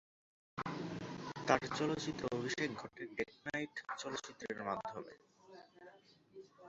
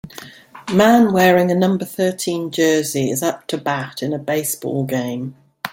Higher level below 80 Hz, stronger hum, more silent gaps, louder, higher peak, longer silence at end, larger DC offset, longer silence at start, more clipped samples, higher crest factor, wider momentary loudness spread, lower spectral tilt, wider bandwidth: second, -72 dBFS vs -58 dBFS; neither; neither; second, -41 LUFS vs -18 LUFS; second, -14 dBFS vs 0 dBFS; about the same, 0 s vs 0 s; neither; first, 0.55 s vs 0.05 s; neither; first, 28 dB vs 18 dB; first, 24 LU vs 15 LU; second, -3.5 dB/octave vs -5 dB/octave; second, 8 kHz vs 17 kHz